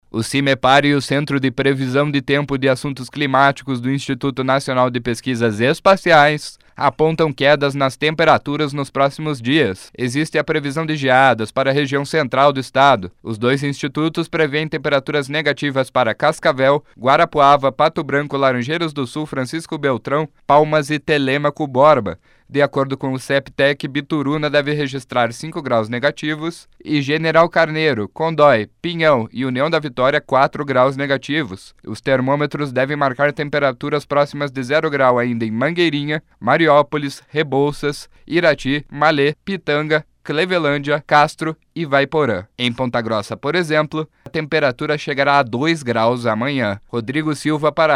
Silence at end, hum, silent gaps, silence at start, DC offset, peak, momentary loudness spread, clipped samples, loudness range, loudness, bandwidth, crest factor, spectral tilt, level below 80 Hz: 0 s; none; none; 0.15 s; under 0.1%; 0 dBFS; 9 LU; under 0.1%; 3 LU; -17 LUFS; 14 kHz; 16 dB; -5.5 dB/octave; -52 dBFS